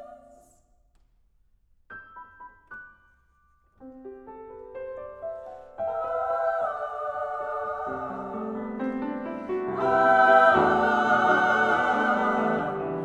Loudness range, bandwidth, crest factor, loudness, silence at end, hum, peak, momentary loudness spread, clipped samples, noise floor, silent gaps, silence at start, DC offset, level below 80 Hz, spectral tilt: 21 LU; 9 kHz; 22 dB; -24 LUFS; 0 s; none; -6 dBFS; 25 LU; under 0.1%; -64 dBFS; none; 0 s; under 0.1%; -60 dBFS; -6 dB/octave